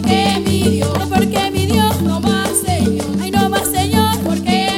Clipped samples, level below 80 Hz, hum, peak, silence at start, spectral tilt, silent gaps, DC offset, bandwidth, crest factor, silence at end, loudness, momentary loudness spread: under 0.1%; -36 dBFS; none; 0 dBFS; 0 s; -4.5 dB/octave; none; under 0.1%; 17 kHz; 14 dB; 0 s; -15 LUFS; 3 LU